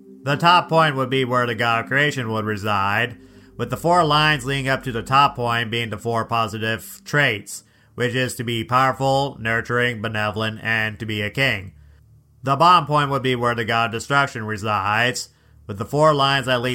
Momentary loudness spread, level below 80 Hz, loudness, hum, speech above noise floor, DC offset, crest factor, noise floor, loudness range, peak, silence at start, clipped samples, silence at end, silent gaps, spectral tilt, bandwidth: 10 LU; -52 dBFS; -20 LUFS; none; 31 dB; under 0.1%; 20 dB; -51 dBFS; 3 LU; -2 dBFS; 0.05 s; under 0.1%; 0 s; none; -4.5 dB/octave; 16.5 kHz